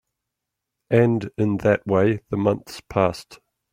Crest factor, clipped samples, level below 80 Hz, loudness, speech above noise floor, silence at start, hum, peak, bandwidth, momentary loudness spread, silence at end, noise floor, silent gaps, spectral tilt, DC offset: 18 dB; under 0.1%; -54 dBFS; -22 LUFS; 62 dB; 0.9 s; none; -4 dBFS; 16 kHz; 7 LU; 0.4 s; -83 dBFS; none; -7.5 dB/octave; under 0.1%